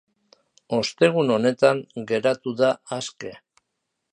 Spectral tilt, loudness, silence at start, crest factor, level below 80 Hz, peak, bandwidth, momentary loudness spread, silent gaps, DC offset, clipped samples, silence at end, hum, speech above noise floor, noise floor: -5 dB/octave; -22 LUFS; 0.7 s; 20 dB; -68 dBFS; -4 dBFS; 10.5 kHz; 13 LU; none; under 0.1%; under 0.1%; 0.75 s; none; 57 dB; -79 dBFS